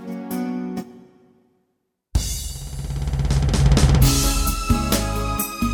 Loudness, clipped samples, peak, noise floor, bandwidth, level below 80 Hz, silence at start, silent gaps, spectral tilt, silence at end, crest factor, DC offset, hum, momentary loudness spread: -21 LUFS; under 0.1%; -2 dBFS; -73 dBFS; over 20 kHz; -24 dBFS; 0 s; none; -5 dB/octave; 0 s; 18 dB; under 0.1%; none; 14 LU